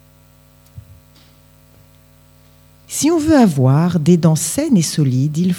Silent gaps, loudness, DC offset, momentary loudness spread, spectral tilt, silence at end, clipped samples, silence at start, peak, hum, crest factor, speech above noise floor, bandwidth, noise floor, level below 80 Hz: none; -14 LUFS; under 0.1%; 5 LU; -6 dB/octave; 0 s; under 0.1%; 0.75 s; 0 dBFS; none; 16 dB; 35 dB; 20 kHz; -48 dBFS; -48 dBFS